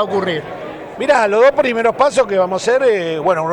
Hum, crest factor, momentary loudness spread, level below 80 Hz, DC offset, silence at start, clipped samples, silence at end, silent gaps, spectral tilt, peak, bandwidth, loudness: none; 14 dB; 12 LU; -52 dBFS; under 0.1%; 0 s; under 0.1%; 0 s; none; -4.5 dB/octave; -2 dBFS; 17.5 kHz; -15 LUFS